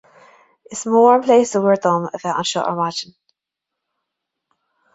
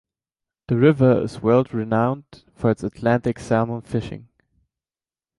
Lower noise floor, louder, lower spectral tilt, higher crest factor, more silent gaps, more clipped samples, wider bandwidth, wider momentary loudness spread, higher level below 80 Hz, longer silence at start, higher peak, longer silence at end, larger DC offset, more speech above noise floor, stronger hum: second, -83 dBFS vs under -90 dBFS; first, -17 LUFS vs -21 LUFS; second, -4.5 dB/octave vs -8.5 dB/octave; about the same, 18 dB vs 18 dB; neither; neither; second, 8 kHz vs 11 kHz; first, 16 LU vs 11 LU; second, -66 dBFS vs -52 dBFS; about the same, 0.7 s vs 0.7 s; about the same, -2 dBFS vs -4 dBFS; first, 1.9 s vs 1.2 s; neither; second, 66 dB vs over 70 dB; neither